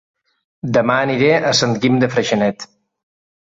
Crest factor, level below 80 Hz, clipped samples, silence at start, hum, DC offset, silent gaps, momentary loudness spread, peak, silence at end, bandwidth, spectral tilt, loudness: 16 dB; -56 dBFS; under 0.1%; 0.65 s; none; under 0.1%; none; 13 LU; -2 dBFS; 0.75 s; 8 kHz; -4.5 dB/octave; -16 LUFS